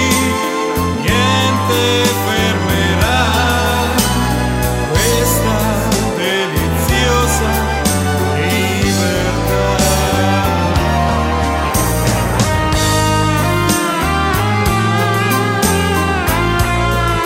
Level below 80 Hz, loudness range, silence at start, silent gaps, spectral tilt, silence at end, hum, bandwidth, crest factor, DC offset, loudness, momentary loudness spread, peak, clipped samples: -24 dBFS; 1 LU; 0 s; none; -4.5 dB/octave; 0 s; none; 16.5 kHz; 14 dB; under 0.1%; -14 LUFS; 3 LU; 0 dBFS; under 0.1%